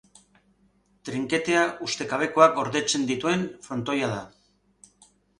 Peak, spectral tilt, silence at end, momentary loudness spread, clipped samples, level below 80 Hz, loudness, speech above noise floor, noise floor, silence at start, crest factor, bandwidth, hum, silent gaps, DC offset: -2 dBFS; -4 dB/octave; 1.15 s; 13 LU; under 0.1%; -64 dBFS; -25 LUFS; 40 dB; -64 dBFS; 1.05 s; 24 dB; 11.5 kHz; 50 Hz at -60 dBFS; none; under 0.1%